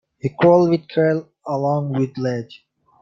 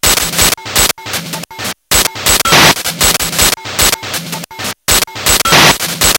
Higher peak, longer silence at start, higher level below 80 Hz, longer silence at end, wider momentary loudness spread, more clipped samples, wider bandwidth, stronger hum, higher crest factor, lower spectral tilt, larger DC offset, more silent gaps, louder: about the same, -2 dBFS vs 0 dBFS; first, 0.25 s vs 0.05 s; second, -62 dBFS vs -28 dBFS; first, 0.45 s vs 0 s; about the same, 14 LU vs 14 LU; second, under 0.1% vs 0.9%; second, 7.2 kHz vs over 20 kHz; neither; first, 18 dB vs 12 dB; first, -8.5 dB/octave vs -1 dB/octave; neither; neither; second, -19 LUFS vs -9 LUFS